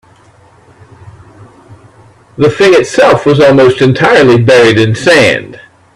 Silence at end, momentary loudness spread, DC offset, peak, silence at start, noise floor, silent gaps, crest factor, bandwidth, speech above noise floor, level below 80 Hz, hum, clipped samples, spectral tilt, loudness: 0.4 s; 5 LU; under 0.1%; 0 dBFS; 1.7 s; -42 dBFS; none; 8 dB; 12.5 kHz; 36 dB; -44 dBFS; none; 0.3%; -5.5 dB/octave; -6 LUFS